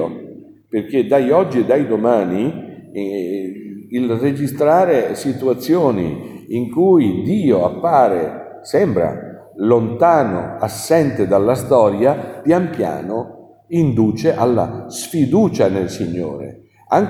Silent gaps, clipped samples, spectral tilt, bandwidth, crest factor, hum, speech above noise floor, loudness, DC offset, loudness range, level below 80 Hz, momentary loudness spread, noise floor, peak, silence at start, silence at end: none; under 0.1%; -7 dB/octave; 16 kHz; 16 dB; none; 22 dB; -17 LUFS; under 0.1%; 3 LU; -52 dBFS; 12 LU; -38 dBFS; 0 dBFS; 0 s; 0 s